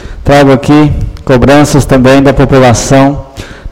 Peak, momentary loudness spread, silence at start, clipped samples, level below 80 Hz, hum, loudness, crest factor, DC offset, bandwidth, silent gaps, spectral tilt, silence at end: 0 dBFS; 9 LU; 0 s; 6%; -20 dBFS; none; -5 LUFS; 6 dB; under 0.1%; 16 kHz; none; -6 dB/octave; 0 s